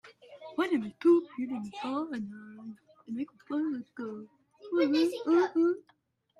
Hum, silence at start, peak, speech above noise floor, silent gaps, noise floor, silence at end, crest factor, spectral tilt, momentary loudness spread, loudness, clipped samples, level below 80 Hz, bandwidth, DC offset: none; 0.05 s; -16 dBFS; 20 dB; none; -50 dBFS; 0.6 s; 16 dB; -6 dB/octave; 20 LU; -30 LUFS; under 0.1%; -80 dBFS; 11.5 kHz; under 0.1%